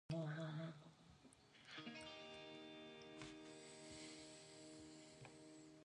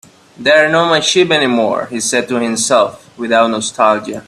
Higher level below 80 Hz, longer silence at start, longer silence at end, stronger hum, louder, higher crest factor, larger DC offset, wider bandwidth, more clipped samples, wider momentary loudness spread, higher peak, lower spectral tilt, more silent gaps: second, -80 dBFS vs -58 dBFS; second, 0.1 s vs 0.4 s; about the same, 0 s vs 0.05 s; neither; second, -55 LUFS vs -13 LUFS; first, 20 dB vs 14 dB; neither; second, 11 kHz vs 13.5 kHz; neither; first, 15 LU vs 6 LU; second, -36 dBFS vs 0 dBFS; first, -5 dB/octave vs -3 dB/octave; neither